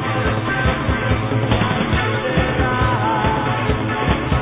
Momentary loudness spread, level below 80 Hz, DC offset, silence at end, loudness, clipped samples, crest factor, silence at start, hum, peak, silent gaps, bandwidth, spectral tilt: 2 LU; -28 dBFS; under 0.1%; 0 s; -18 LUFS; under 0.1%; 16 dB; 0 s; none; -2 dBFS; none; 4 kHz; -10.5 dB/octave